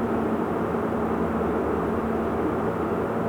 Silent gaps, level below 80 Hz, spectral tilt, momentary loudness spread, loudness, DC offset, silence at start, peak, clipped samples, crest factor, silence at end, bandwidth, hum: none; -44 dBFS; -8.5 dB/octave; 1 LU; -26 LUFS; under 0.1%; 0 s; -14 dBFS; under 0.1%; 12 dB; 0 s; 20 kHz; none